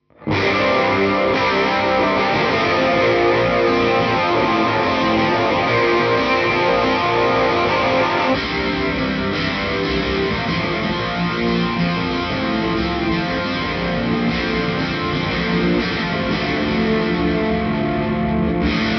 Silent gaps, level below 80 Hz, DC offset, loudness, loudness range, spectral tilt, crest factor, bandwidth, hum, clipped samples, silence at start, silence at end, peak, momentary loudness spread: none; -36 dBFS; under 0.1%; -18 LUFS; 4 LU; -6.5 dB/octave; 12 dB; 6.6 kHz; none; under 0.1%; 0.2 s; 0 s; -6 dBFS; 4 LU